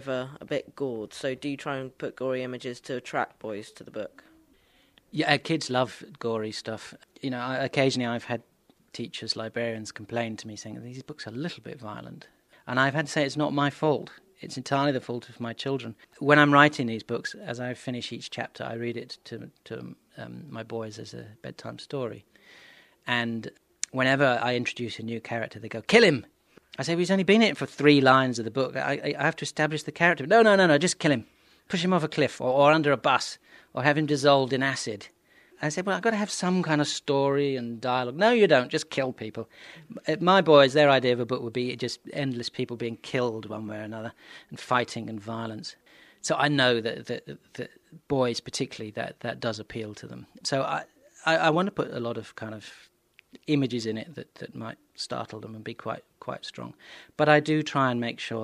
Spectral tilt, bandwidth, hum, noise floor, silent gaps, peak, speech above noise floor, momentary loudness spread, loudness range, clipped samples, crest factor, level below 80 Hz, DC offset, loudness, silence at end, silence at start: -5 dB/octave; 12.5 kHz; none; -63 dBFS; none; -2 dBFS; 36 dB; 20 LU; 12 LU; under 0.1%; 26 dB; -70 dBFS; under 0.1%; -26 LUFS; 0 s; 0 s